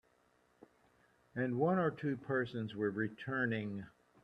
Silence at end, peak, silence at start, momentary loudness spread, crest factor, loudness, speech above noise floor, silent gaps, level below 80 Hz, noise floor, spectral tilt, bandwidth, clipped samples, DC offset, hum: 0.35 s; -20 dBFS; 1.35 s; 12 LU; 18 dB; -37 LUFS; 36 dB; none; -76 dBFS; -73 dBFS; -9 dB/octave; 6.4 kHz; under 0.1%; under 0.1%; none